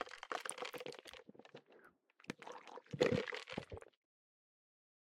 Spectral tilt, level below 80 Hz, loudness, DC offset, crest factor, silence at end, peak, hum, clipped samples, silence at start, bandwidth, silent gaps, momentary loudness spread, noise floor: -4.5 dB/octave; -74 dBFS; -44 LUFS; under 0.1%; 28 dB; 1.25 s; -18 dBFS; none; under 0.1%; 0 s; 16 kHz; none; 23 LU; -68 dBFS